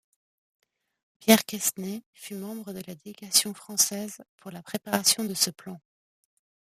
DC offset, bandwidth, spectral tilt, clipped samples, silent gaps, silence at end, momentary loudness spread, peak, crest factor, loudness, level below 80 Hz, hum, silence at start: under 0.1%; 15.5 kHz; -2 dB/octave; under 0.1%; 2.06-2.13 s, 4.29-4.38 s; 1 s; 22 LU; -2 dBFS; 28 dB; -24 LUFS; -74 dBFS; none; 1.2 s